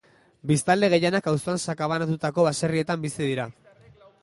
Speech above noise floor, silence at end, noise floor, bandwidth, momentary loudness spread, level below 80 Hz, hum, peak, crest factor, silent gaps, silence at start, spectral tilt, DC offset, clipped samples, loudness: 30 dB; 0.7 s; -53 dBFS; 11.5 kHz; 8 LU; -62 dBFS; none; -6 dBFS; 18 dB; none; 0.45 s; -5.5 dB/octave; under 0.1%; under 0.1%; -24 LUFS